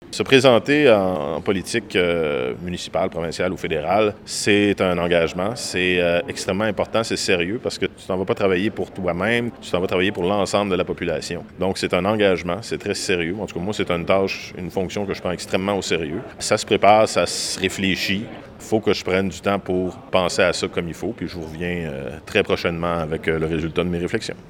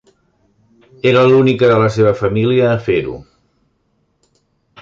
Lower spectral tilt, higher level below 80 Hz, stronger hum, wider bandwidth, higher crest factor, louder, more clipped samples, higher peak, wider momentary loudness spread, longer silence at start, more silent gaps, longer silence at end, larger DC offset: second, -4.5 dB/octave vs -7.5 dB/octave; about the same, -48 dBFS vs -46 dBFS; neither; first, 17.5 kHz vs 7.6 kHz; first, 20 dB vs 14 dB; second, -21 LUFS vs -13 LUFS; neither; about the same, 0 dBFS vs 0 dBFS; about the same, 10 LU vs 8 LU; second, 0 s vs 1.05 s; neither; second, 0 s vs 1.6 s; neither